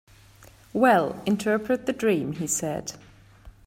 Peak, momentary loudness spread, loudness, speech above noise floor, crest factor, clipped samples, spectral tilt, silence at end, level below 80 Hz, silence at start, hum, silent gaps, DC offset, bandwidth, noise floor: -6 dBFS; 12 LU; -25 LUFS; 28 dB; 20 dB; under 0.1%; -4.5 dB/octave; 0.15 s; -56 dBFS; 0.75 s; none; none; under 0.1%; 16 kHz; -52 dBFS